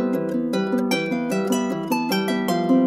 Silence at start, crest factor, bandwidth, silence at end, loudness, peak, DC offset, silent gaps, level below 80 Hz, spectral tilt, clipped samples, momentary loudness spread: 0 s; 14 dB; 16 kHz; 0 s; -22 LUFS; -6 dBFS; under 0.1%; none; -72 dBFS; -5.5 dB/octave; under 0.1%; 2 LU